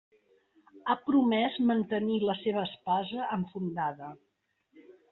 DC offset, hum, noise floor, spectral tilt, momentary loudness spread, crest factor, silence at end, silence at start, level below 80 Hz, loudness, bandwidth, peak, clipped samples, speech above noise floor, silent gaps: under 0.1%; none; -73 dBFS; -4.5 dB/octave; 9 LU; 16 dB; 0.2 s; 0.75 s; -72 dBFS; -30 LUFS; 4.2 kHz; -16 dBFS; under 0.1%; 44 dB; none